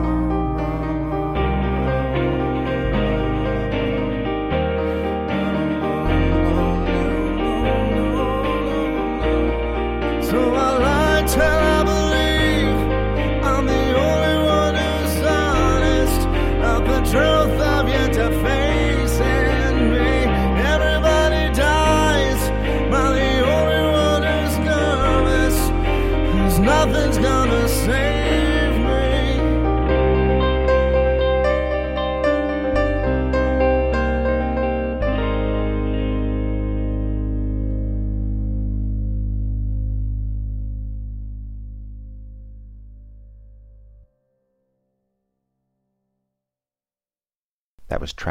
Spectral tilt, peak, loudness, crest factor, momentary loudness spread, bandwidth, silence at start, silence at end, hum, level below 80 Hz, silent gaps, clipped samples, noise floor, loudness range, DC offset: -6 dB/octave; -4 dBFS; -19 LUFS; 14 dB; 8 LU; 16.5 kHz; 0 s; 0 s; none; -24 dBFS; 47.36-47.78 s; under 0.1%; under -90 dBFS; 8 LU; under 0.1%